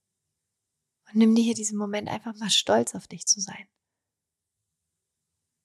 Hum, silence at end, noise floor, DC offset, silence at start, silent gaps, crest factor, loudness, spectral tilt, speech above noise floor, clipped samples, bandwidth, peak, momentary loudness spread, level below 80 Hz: none; 2 s; -86 dBFS; under 0.1%; 1.15 s; none; 20 dB; -25 LUFS; -3 dB/octave; 61 dB; under 0.1%; 13 kHz; -10 dBFS; 12 LU; -74 dBFS